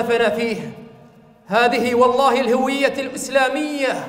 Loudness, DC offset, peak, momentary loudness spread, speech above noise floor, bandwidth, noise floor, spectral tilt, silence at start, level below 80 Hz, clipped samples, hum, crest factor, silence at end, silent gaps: -18 LUFS; under 0.1%; -2 dBFS; 9 LU; 29 dB; 16 kHz; -47 dBFS; -4 dB/octave; 0 s; -58 dBFS; under 0.1%; none; 16 dB; 0 s; none